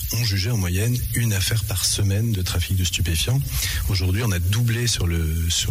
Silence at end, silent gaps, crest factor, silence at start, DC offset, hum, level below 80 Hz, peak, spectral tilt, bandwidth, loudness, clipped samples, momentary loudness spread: 0 s; none; 10 dB; 0 s; under 0.1%; none; -32 dBFS; -10 dBFS; -4 dB/octave; 16 kHz; -22 LUFS; under 0.1%; 2 LU